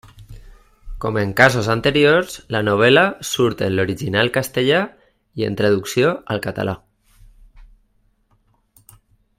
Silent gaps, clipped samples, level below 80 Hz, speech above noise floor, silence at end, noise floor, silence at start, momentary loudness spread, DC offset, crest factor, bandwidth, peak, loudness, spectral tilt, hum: none; under 0.1%; -44 dBFS; 44 dB; 1.8 s; -61 dBFS; 0.2 s; 12 LU; under 0.1%; 20 dB; 16 kHz; 0 dBFS; -18 LUFS; -5 dB/octave; none